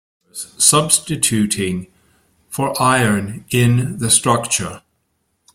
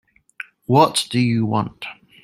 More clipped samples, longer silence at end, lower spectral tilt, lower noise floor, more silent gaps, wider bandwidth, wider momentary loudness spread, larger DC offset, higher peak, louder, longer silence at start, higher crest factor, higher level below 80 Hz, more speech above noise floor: neither; first, 0.75 s vs 0.3 s; second, -3.5 dB/octave vs -5 dB/octave; first, -68 dBFS vs -40 dBFS; neither; about the same, 16.5 kHz vs 15 kHz; second, 17 LU vs 20 LU; neither; about the same, 0 dBFS vs 0 dBFS; first, -15 LUFS vs -18 LUFS; second, 0.35 s vs 0.7 s; about the same, 18 dB vs 20 dB; first, -50 dBFS vs -58 dBFS; first, 51 dB vs 22 dB